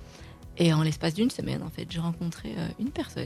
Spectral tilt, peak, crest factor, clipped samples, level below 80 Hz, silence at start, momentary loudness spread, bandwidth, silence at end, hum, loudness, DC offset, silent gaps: -6 dB/octave; -12 dBFS; 18 dB; under 0.1%; -52 dBFS; 0 s; 13 LU; 13.5 kHz; 0 s; none; -29 LUFS; under 0.1%; none